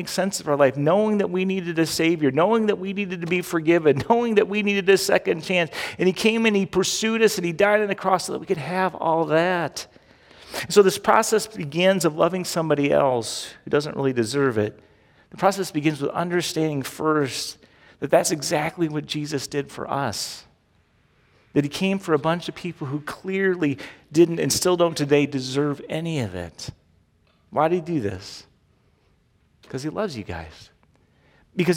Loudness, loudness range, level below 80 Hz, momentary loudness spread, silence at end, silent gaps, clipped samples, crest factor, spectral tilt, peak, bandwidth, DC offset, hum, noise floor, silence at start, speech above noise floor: -22 LUFS; 8 LU; -58 dBFS; 12 LU; 0 s; none; under 0.1%; 20 dB; -4.5 dB/octave; -2 dBFS; 17.5 kHz; under 0.1%; none; -62 dBFS; 0 s; 40 dB